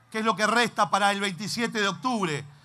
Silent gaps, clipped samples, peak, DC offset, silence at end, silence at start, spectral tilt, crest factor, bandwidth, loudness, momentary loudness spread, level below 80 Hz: none; under 0.1%; -8 dBFS; under 0.1%; 0.15 s; 0.1 s; -3.5 dB/octave; 18 dB; 14.5 kHz; -25 LUFS; 6 LU; -72 dBFS